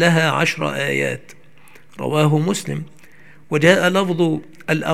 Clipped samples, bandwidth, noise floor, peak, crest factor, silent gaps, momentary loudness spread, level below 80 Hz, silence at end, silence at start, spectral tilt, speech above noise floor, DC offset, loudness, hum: under 0.1%; 15.5 kHz; -49 dBFS; 0 dBFS; 18 dB; none; 14 LU; -62 dBFS; 0 s; 0 s; -5.5 dB/octave; 31 dB; 0.8%; -18 LUFS; none